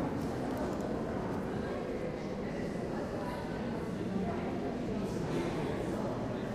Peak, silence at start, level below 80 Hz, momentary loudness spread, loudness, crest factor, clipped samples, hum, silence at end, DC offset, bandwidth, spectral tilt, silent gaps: -22 dBFS; 0 s; -52 dBFS; 3 LU; -37 LUFS; 12 dB; under 0.1%; none; 0 s; under 0.1%; 15 kHz; -7 dB/octave; none